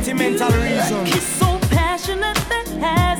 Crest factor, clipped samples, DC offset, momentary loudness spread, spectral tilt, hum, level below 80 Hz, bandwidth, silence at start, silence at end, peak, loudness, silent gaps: 14 dB; under 0.1%; 0.1%; 4 LU; -4.5 dB/octave; none; -28 dBFS; over 20 kHz; 0 s; 0 s; -4 dBFS; -18 LUFS; none